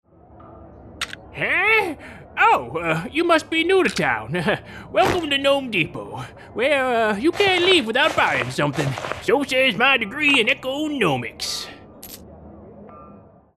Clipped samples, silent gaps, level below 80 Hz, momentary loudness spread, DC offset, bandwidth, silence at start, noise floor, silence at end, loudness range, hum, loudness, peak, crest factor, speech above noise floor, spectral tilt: under 0.1%; none; -52 dBFS; 16 LU; under 0.1%; 13 kHz; 0.4 s; -47 dBFS; 0.35 s; 3 LU; none; -19 LUFS; -4 dBFS; 18 dB; 27 dB; -4 dB/octave